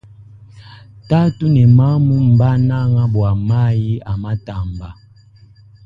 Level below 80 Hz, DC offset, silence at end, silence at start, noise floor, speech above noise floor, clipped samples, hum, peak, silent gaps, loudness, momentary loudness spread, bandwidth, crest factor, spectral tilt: -36 dBFS; under 0.1%; 0.95 s; 0.55 s; -45 dBFS; 32 dB; under 0.1%; none; 0 dBFS; none; -15 LUFS; 15 LU; 5 kHz; 14 dB; -10.5 dB/octave